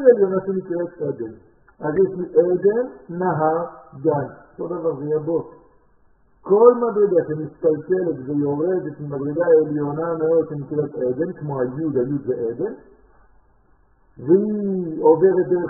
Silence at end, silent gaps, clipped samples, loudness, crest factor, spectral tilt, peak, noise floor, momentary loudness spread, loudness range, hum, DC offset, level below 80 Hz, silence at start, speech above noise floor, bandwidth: 0 s; none; under 0.1%; -20 LUFS; 20 dB; -5.5 dB/octave; 0 dBFS; -58 dBFS; 13 LU; 5 LU; none; under 0.1%; -60 dBFS; 0 s; 38 dB; 2 kHz